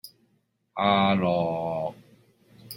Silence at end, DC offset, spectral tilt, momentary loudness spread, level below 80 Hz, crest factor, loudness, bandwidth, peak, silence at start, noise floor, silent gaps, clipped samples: 0 s; under 0.1%; -6.5 dB/octave; 13 LU; -64 dBFS; 20 dB; -25 LUFS; 16.5 kHz; -8 dBFS; 0.05 s; -70 dBFS; none; under 0.1%